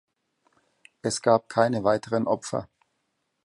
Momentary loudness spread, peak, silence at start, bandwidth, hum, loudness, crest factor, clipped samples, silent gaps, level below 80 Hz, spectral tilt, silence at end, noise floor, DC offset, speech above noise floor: 11 LU; -6 dBFS; 1.05 s; 11.5 kHz; none; -25 LUFS; 22 dB; under 0.1%; none; -64 dBFS; -5 dB/octave; 0.8 s; -77 dBFS; under 0.1%; 52 dB